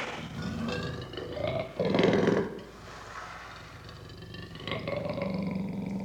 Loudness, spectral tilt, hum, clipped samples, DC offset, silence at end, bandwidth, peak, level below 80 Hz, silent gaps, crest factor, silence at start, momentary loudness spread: -32 LUFS; -6.5 dB/octave; none; under 0.1%; under 0.1%; 0 s; 15 kHz; -12 dBFS; -54 dBFS; none; 22 dB; 0 s; 19 LU